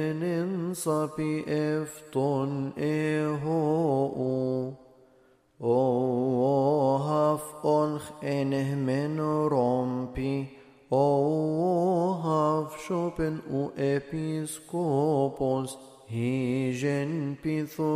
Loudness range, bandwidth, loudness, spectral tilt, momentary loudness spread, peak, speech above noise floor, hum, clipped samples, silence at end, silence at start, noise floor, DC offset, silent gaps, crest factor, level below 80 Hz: 3 LU; 15.5 kHz; -28 LUFS; -7 dB/octave; 7 LU; -12 dBFS; 35 dB; none; under 0.1%; 0 s; 0 s; -62 dBFS; under 0.1%; none; 16 dB; -58 dBFS